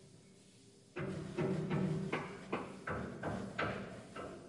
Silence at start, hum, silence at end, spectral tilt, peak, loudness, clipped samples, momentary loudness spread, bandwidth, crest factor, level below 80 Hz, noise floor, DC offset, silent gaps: 0 s; none; 0 s; -7 dB/octave; -26 dBFS; -41 LUFS; under 0.1%; 23 LU; 11.5 kHz; 16 dB; -66 dBFS; -62 dBFS; under 0.1%; none